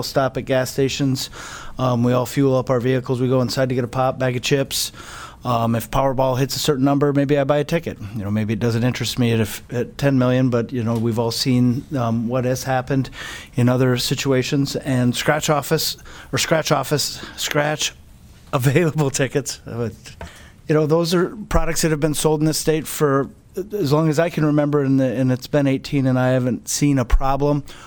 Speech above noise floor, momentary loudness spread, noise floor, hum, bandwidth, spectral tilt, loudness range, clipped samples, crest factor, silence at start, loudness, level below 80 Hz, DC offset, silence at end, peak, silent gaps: 25 dB; 8 LU; -44 dBFS; none; 19.5 kHz; -5.5 dB/octave; 2 LU; under 0.1%; 18 dB; 0 s; -20 LUFS; -34 dBFS; under 0.1%; 0 s; -2 dBFS; none